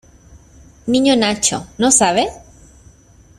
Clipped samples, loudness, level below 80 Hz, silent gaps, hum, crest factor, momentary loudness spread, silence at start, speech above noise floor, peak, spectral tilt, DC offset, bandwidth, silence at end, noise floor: under 0.1%; -15 LUFS; -46 dBFS; none; none; 18 dB; 9 LU; 0.35 s; 32 dB; 0 dBFS; -2.5 dB/octave; under 0.1%; 14 kHz; 1 s; -47 dBFS